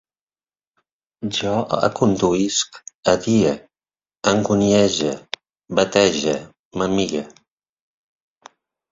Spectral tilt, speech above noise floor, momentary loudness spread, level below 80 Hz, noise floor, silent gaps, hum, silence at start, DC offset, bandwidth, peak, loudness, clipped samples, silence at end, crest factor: -4.5 dB/octave; over 72 dB; 14 LU; -52 dBFS; under -90 dBFS; 2.95-3.03 s, 6.59-6.71 s; none; 1.2 s; under 0.1%; 7.8 kHz; 0 dBFS; -19 LUFS; under 0.1%; 1.6 s; 22 dB